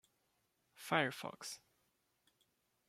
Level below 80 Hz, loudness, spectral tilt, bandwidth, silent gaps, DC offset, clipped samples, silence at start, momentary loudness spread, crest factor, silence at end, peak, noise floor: -88 dBFS; -40 LUFS; -3.5 dB/octave; 16 kHz; none; under 0.1%; under 0.1%; 0.75 s; 18 LU; 28 dB; 1.3 s; -18 dBFS; -81 dBFS